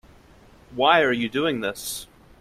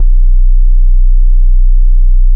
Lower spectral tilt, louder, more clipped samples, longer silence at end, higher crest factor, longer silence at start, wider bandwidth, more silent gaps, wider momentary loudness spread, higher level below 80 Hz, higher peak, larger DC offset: second, -3.5 dB/octave vs -12 dB/octave; second, -22 LUFS vs -13 LUFS; neither; first, 0.35 s vs 0 s; first, 22 dB vs 4 dB; first, 0.7 s vs 0 s; first, 16 kHz vs 0.1 kHz; neither; first, 15 LU vs 0 LU; second, -56 dBFS vs -4 dBFS; second, -4 dBFS vs 0 dBFS; neither